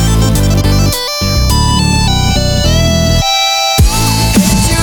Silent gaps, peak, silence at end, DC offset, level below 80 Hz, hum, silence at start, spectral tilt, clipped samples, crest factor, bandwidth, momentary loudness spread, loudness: none; 0 dBFS; 0 s; under 0.1%; -16 dBFS; none; 0 s; -4 dB/octave; under 0.1%; 10 dB; over 20 kHz; 2 LU; -10 LUFS